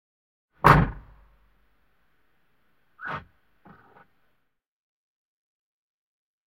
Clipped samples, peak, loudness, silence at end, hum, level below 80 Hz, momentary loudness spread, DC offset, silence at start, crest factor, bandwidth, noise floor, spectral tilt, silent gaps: under 0.1%; 0 dBFS; -22 LUFS; 3.3 s; none; -42 dBFS; 20 LU; under 0.1%; 0.65 s; 30 dB; 16 kHz; -73 dBFS; -7 dB/octave; none